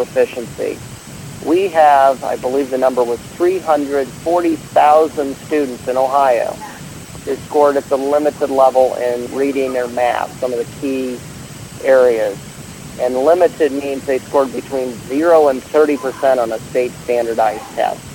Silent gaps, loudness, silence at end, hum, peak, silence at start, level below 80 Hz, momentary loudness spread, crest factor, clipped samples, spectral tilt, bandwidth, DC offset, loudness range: none; -16 LUFS; 0 s; none; 0 dBFS; 0 s; -50 dBFS; 14 LU; 16 dB; under 0.1%; -5 dB/octave; 17.5 kHz; under 0.1%; 2 LU